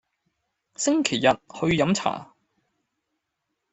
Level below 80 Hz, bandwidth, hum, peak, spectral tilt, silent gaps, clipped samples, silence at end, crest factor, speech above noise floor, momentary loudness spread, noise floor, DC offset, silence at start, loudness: -58 dBFS; 8.4 kHz; none; -4 dBFS; -4 dB/octave; none; under 0.1%; 1.5 s; 22 dB; 57 dB; 7 LU; -80 dBFS; under 0.1%; 0.8 s; -23 LUFS